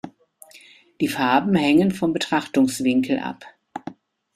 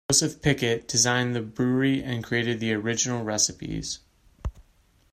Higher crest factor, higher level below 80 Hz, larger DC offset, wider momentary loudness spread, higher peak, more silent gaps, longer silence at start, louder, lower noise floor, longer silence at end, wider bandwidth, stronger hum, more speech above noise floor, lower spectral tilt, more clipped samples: about the same, 18 dB vs 20 dB; second, -60 dBFS vs -46 dBFS; neither; first, 20 LU vs 15 LU; about the same, -4 dBFS vs -6 dBFS; neither; about the same, 0.05 s vs 0.1 s; first, -20 LUFS vs -25 LUFS; second, -50 dBFS vs -61 dBFS; about the same, 0.45 s vs 0.5 s; about the same, 15 kHz vs 15.5 kHz; neither; second, 30 dB vs 36 dB; first, -5.5 dB/octave vs -3.5 dB/octave; neither